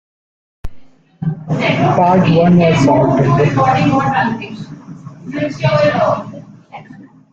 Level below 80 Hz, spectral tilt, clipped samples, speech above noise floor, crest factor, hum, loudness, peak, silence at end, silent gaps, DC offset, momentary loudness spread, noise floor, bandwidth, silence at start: -40 dBFS; -7.5 dB/octave; under 0.1%; 26 dB; 14 dB; none; -13 LUFS; -2 dBFS; 0.3 s; none; under 0.1%; 21 LU; -39 dBFS; 7.8 kHz; 0.65 s